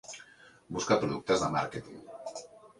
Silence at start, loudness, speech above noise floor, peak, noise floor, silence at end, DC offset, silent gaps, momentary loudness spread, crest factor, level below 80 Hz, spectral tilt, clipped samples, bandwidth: 0.05 s; -31 LUFS; 25 dB; -14 dBFS; -56 dBFS; 0.1 s; under 0.1%; none; 18 LU; 20 dB; -62 dBFS; -4.5 dB/octave; under 0.1%; 11.5 kHz